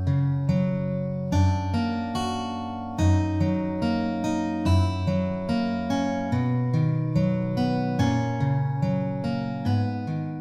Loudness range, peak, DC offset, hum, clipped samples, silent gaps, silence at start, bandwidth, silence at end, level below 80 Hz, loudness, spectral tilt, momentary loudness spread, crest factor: 1 LU; -10 dBFS; under 0.1%; none; under 0.1%; none; 0 s; 11 kHz; 0 s; -46 dBFS; -25 LUFS; -7.5 dB/octave; 5 LU; 14 dB